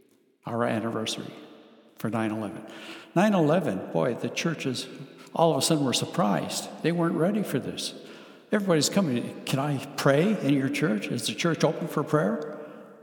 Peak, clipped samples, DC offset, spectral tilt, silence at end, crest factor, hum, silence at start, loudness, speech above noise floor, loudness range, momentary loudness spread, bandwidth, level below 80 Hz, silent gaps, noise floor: -8 dBFS; under 0.1%; under 0.1%; -5 dB/octave; 0 s; 20 dB; none; 0.45 s; -27 LUFS; 26 dB; 2 LU; 15 LU; 19 kHz; -76 dBFS; none; -52 dBFS